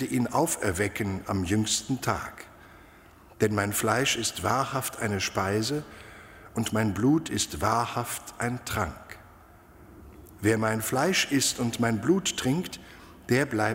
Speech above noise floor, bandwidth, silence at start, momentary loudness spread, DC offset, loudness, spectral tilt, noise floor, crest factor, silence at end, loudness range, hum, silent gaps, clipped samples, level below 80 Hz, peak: 26 dB; 16 kHz; 0 s; 16 LU; under 0.1%; -27 LUFS; -4 dB/octave; -53 dBFS; 20 dB; 0 s; 3 LU; none; none; under 0.1%; -52 dBFS; -8 dBFS